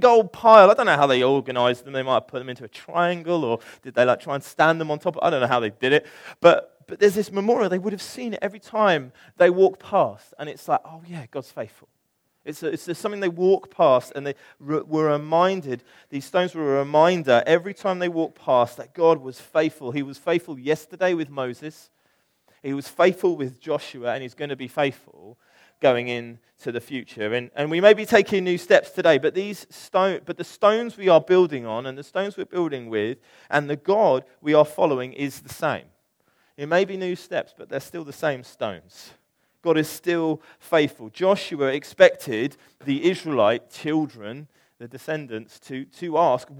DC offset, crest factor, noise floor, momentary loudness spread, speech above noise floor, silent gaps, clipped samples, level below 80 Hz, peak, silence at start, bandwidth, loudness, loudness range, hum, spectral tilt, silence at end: under 0.1%; 22 dB; -71 dBFS; 16 LU; 49 dB; none; under 0.1%; -72 dBFS; 0 dBFS; 0 s; 17.5 kHz; -22 LUFS; 7 LU; none; -5.5 dB/octave; 0 s